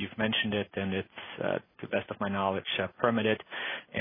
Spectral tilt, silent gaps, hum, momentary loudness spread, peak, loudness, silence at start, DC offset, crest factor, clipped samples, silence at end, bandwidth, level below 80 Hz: -9 dB/octave; none; none; 8 LU; -8 dBFS; -31 LUFS; 0 s; under 0.1%; 22 dB; under 0.1%; 0 s; 3.8 kHz; -68 dBFS